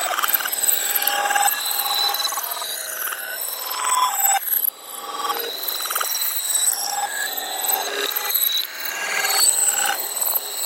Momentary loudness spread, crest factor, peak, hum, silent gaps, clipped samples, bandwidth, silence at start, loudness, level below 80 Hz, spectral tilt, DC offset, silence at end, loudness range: 8 LU; 20 dB; -2 dBFS; none; none; under 0.1%; 17 kHz; 0 s; -20 LUFS; -84 dBFS; 3 dB/octave; under 0.1%; 0 s; 2 LU